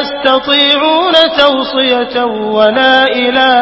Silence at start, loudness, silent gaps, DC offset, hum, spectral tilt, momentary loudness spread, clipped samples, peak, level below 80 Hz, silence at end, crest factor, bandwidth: 0 s; -9 LUFS; none; under 0.1%; none; -4.5 dB/octave; 5 LU; 0.3%; 0 dBFS; -48 dBFS; 0 s; 10 dB; 8 kHz